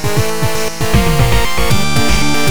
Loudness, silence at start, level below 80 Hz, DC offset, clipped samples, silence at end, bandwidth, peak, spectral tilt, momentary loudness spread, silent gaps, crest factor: -14 LUFS; 0 s; -20 dBFS; 20%; under 0.1%; 0 s; over 20 kHz; 0 dBFS; -4.5 dB/octave; 4 LU; none; 14 dB